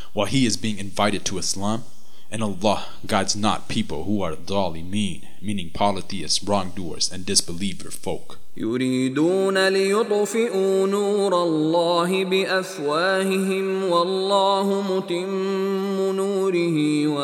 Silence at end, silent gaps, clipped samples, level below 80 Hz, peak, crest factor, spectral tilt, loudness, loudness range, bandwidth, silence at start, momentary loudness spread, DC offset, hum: 0 s; none; under 0.1%; -54 dBFS; -2 dBFS; 20 dB; -4 dB/octave; -22 LUFS; 5 LU; 17 kHz; 0 s; 10 LU; under 0.1%; none